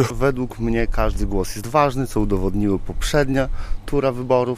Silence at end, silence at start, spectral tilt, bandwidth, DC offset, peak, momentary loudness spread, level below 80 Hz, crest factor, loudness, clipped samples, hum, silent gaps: 0 s; 0 s; -6 dB/octave; 15.5 kHz; under 0.1%; -4 dBFS; 6 LU; -26 dBFS; 16 dB; -21 LUFS; under 0.1%; none; none